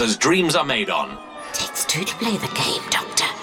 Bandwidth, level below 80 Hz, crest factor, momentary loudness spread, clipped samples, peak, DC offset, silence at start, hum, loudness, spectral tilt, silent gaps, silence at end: 18 kHz; -54 dBFS; 20 dB; 8 LU; under 0.1%; -2 dBFS; under 0.1%; 0 s; none; -21 LUFS; -2.5 dB/octave; none; 0 s